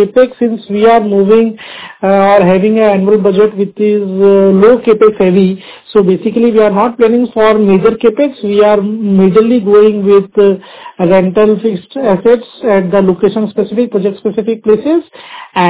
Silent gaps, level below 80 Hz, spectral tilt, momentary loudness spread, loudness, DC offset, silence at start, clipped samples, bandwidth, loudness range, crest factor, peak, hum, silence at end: none; -48 dBFS; -11.5 dB/octave; 8 LU; -9 LUFS; 0.4%; 0 s; 0.9%; 4 kHz; 3 LU; 8 dB; 0 dBFS; none; 0 s